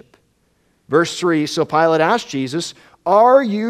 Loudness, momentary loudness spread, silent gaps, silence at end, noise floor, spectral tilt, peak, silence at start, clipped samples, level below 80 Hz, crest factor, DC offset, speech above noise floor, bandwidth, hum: -16 LUFS; 12 LU; none; 0 s; -61 dBFS; -5 dB/octave; 0 dBFS; 0.9 s; under 0.1%; -62 dBFS; 16 dB; under 0.1%; 46 dB; 14 kHz; none